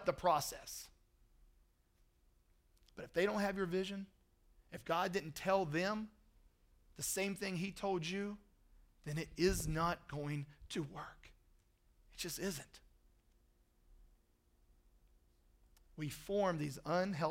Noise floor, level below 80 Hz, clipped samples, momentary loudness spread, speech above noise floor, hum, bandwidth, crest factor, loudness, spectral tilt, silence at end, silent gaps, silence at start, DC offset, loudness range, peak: -74 dBFS; -60 dBFS; under 0.1%; 17 LU; 35 dB; none; 16 kHz; 22 dB; -40 LUFS; -4.5 dB/octave; 0 s; none; 0 s; under 0.1%; 10 LU; -20 dBFS